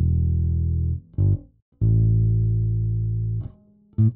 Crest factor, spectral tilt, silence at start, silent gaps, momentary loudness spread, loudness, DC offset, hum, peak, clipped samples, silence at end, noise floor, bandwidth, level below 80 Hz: 10 dB; -16.5 dB/octave; 0 s; 1.62-1.72 s; 9 LU; -23 LUFS; 0.2%; none; -10 dBFS; under 0.1%; 0 s; -51 dBFS; 0.9 kHz; -30 dBFS